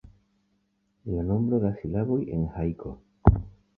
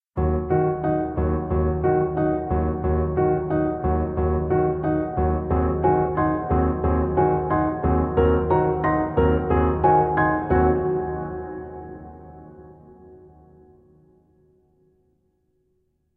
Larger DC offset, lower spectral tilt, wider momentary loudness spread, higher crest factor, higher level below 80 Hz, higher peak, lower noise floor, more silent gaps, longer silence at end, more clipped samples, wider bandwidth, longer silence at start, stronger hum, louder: neither; about the same, -13 dB/octave vs -12 dB/octave; first, 13 LU vs 7 LU; first, 26 dB vs 16 dB; about the same, -36 dBFS vs -32 dBFS; first, -2 dBFS vs -6 dBFS; about the same, -72 dBFS vs -69 dBFS; neither; second, 0.25 s vs 3 s; neither; second, 2.9 kHz vs 3.6 kHz; first, 1.05 s vs 0.15 s; neither; second, -27 LUFS vs -22 LUFS